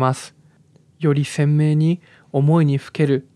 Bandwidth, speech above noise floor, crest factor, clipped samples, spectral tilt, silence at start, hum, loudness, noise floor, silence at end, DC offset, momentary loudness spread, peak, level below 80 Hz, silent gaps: 11 kHz; 36 dB; 16 dB; under 0.1%; -7.5 dB/octave; 0 s; none; -19 LUFS; -54 dBFS; 0.15 s; under 0.1%; 10 LU; -4 dBFS; -72 dBFS; none